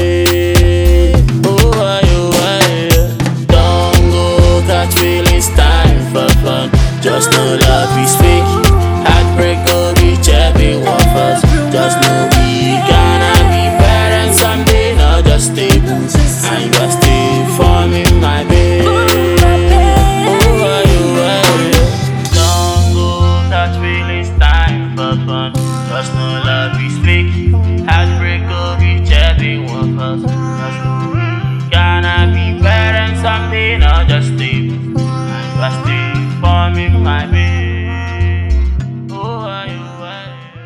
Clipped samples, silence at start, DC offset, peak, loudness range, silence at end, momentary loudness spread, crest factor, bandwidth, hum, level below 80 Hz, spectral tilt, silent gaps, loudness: under 0.1%; 0 s; under 0.1%; 0 dBFS; 4 LU; 0 s; 7 LU; 10 dB; 19.5 kHz; none; -16 dBFS; -5 dB/octave; none; -11 LUFS